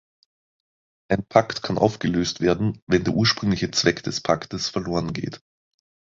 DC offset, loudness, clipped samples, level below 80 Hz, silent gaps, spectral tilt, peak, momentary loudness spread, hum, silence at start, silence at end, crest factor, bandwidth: under 0.1%; -23 LUFS; under 0.1%; -48 dBFS; 2.82-2.87 s; -5 dB/octave; -2 dBFS; 7 LU; none; 1.1 s; 0.75 s; 22 dB; 7.8 kHz